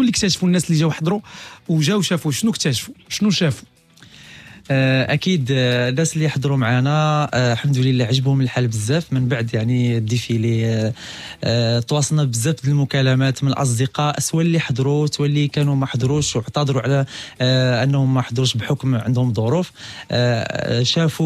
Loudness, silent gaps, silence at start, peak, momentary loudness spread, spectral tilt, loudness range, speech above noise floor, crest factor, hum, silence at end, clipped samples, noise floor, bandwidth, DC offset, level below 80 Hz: -19 LUFS; none; 0 s; -6 dBFS; 5 LU; -5.5 dB/octave; 2 LU; 28 dB; 14 dB; none; 0 s; under 0.1%; -46 dBFS; 14 kHz; under 0.1%; -52 dBFS